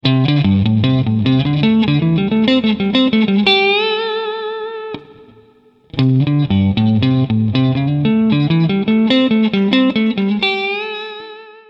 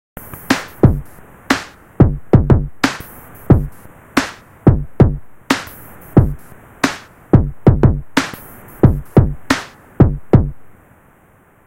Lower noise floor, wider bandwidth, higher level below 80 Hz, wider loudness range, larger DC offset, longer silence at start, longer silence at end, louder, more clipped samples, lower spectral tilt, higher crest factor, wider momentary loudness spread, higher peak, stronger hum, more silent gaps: about the same, -49 dBFS vs -50 dBFS; second, 6 kHz vs 16.5 kHz; second, -46 dBFS vs -26 dBFS; about the same, 4 LU vs 2 LU; neither; about the same, 0.05 s vs 0.15 s; second, 0.2 s vs 1 s; about the same, -14 LUFS vs -16 LUFS; second, under 0.1% vs 0.5%; first, -8.5 dB/octave vs -7 dB/octave; about the same, 14 dB vs 16 dB; second, 11 LU vs 19 LU; about the same, 0 dBFS vs 0 dBFS; neither; neither